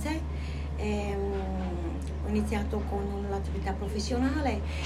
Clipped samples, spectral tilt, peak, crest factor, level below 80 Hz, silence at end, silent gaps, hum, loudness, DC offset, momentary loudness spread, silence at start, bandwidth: under 0.1%; -6.5 dB/octave; -16 dBFS; 14 dB; -36 dBFS; 0 s; none; none; -32 LUFS; under 0.1%; 6 LU; 0 s; 12.5 kHz